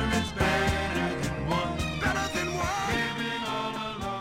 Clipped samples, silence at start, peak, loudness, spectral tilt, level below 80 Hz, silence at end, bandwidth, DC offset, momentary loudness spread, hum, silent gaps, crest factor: under 0.1%; 0 s; -12 dBFS; -28 LUFS; -4.5 dB/octave; -40 dBFS; 0 s; 16 kHz; under 0.1%; 5 LU; none; none; 16 dB